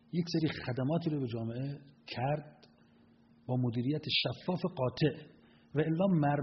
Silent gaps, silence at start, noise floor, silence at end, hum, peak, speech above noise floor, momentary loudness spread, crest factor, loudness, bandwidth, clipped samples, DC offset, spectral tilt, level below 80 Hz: none; 0.15 s; -63 dBFS; 0 s; none; -18 dBFS; 30 dB; 10 LU; 16 dB; -34 LUFS; 6 kHz; under 0.1%; under 0.1%; -5.5 dB/octave; -68 dBFS